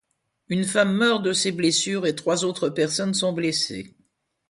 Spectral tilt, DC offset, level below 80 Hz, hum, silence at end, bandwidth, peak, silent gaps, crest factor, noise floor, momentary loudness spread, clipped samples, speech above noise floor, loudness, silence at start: -3.5 dB/octave; under 0.1%; -64 dBFS; none; 0.6 s; 11.5 kHz; -6 dBFS; none; 18 dB; -68 dBFS; 6 LU; under 0.1%; 45 dB; -22 LUFS; 0.5 s